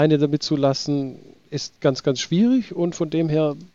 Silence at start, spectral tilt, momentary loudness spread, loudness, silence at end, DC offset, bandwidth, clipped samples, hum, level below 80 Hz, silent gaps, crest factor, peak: 0 s; -6 dB/octave; 11 LU; -21 LUFS; 0.1 s; 0.2%; 7.8 kHz; under 0.1%; none; -58 dBFS; none; 16 dB; -6 dBFS